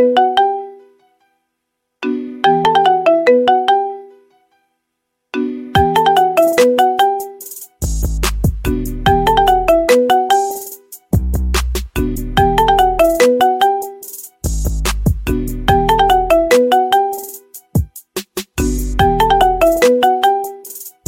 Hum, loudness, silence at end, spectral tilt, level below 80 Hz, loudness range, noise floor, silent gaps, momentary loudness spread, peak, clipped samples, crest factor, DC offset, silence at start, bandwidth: none; -14 LUFS; 0.2 s; -5 dB/octave; -26 dBFS; 1 LU; -73 dBFS; none; 14 LU; 0 dBFS; under 0.1%; 14 dB; under 0.1%; 0 s; 17 kHz